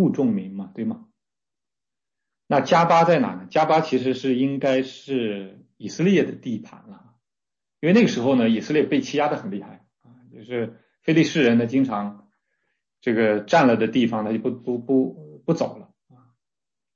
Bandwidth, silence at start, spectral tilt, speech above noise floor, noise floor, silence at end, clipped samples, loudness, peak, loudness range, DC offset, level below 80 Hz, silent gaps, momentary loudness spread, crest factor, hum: 7.4 kHz; 0 s; -6.5 dB/octave; over 69 dB; under -90 dBFS; 1.1 s; under 0.1%; -21 LUFS; -4 dBFS; 4 LU; under 0.1%; -70 dBFS; none; 14 LU; 18 dB; none